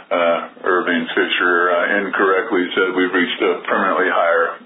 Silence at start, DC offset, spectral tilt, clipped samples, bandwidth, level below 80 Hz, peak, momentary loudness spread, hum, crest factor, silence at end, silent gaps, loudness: 0 s; under 0.1%; -8 dB/octave; under 0.1%; 4 kHz; -66 dBFS; -4 dBFS; 4 LU; none; 14 dB; 0 s; none; -17 LUFS